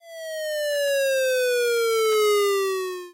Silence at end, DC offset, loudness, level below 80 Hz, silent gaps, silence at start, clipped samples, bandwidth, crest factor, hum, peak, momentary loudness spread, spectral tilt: 0 s; under 0.1%; -22 LUFS; -74 dBFS; none; 0.05 s; under 0.1%; 16 kHz; 6 dB; none; -16 dBFS; 9 LU; 0.5 dB/octave